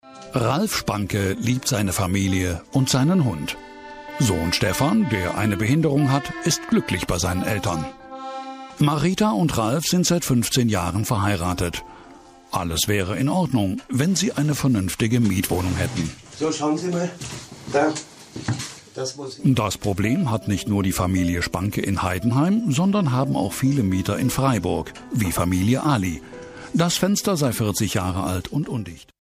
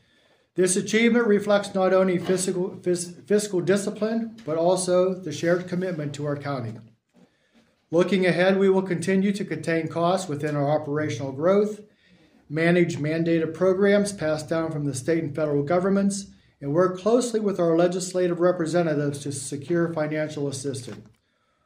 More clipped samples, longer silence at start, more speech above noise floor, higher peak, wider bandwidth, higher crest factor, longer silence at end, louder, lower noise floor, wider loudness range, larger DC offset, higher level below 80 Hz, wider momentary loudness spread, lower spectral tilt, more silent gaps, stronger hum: neither; second, 0.05 s vs 0.55 s; second, 25 dB vs 46 dB; about the same, -8 dBFS vs -8 dBFS; about the same, 15.5 kHz vs 16 kHz; about the same, 14 dB vs 16 dB; second, 0.2 s vs 0.6 s; about the same, -22 LUFS vs -24 LUFS; second, -46 dBFS vs -69 dBFS; about the same, 3 LU vs 3 LU; neither; first, -44 dBFS vs -64 dBFS; about the same, 10 LU vs 9 LU; about the same, -5 dB/octave vs -5.5 dB/octave; neither; neither